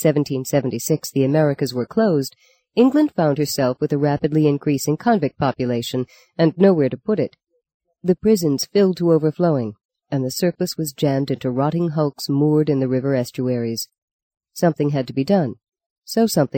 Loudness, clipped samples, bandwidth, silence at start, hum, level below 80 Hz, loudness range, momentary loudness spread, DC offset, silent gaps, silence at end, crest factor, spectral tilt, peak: -20 LUFS; under 0.1%; 17 kHz; 0 s; none; -58 dBFS; 3 LU; 8 LU; under 0.1%; 7.74-7.80 s, 9.85-9.89 s, 13.98-14.31 s, 15.86-16.02 s; 0 s; 16 dB; -6.5 dB/octave; -2 dBFS